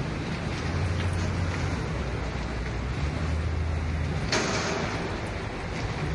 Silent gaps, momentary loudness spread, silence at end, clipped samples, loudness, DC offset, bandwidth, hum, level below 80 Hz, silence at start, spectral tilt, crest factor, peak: none; 5 LU; 0 s; under 0.1%; -30 LUFS; under 0.1%; 11.5 kHz; none; -36 dBFS; 0 s; -5 dB/octave; 16 dB; -12 dBFS